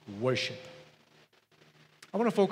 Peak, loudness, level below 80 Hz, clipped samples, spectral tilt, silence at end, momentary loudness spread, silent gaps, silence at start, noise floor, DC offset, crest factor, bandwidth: -14 dBFS; -31 LUFS; -82 dBFS; under 0.1%; -5.5 dB/octave; 0 s; 21 LU; none; 0.05 s; -64 dBFS; under 0.1%; 20 dB; 14 kHz